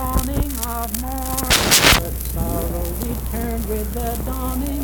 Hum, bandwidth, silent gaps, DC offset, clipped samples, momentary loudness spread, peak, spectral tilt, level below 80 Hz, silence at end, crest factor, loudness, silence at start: none; 19.5 kHz; none; under 0.1%; under 0.1%; 13 LU; 0 dBFS; -3 dB/octave; -26 dBFS; 0 s; 20 dB; -19 LUFS; 0 s